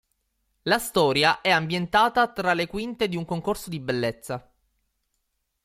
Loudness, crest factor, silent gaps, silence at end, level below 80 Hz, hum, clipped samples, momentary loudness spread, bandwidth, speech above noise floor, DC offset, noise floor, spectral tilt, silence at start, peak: -24 LUFS; 18 dB; none; 1.25 s; -56 dBFS; none; under 0.1%; 10 LU; 16.5 kHz; 52 dB; under 0.1%; -76 dBFS; -4.5 dB/octave; 0.65 s; -6 dBFS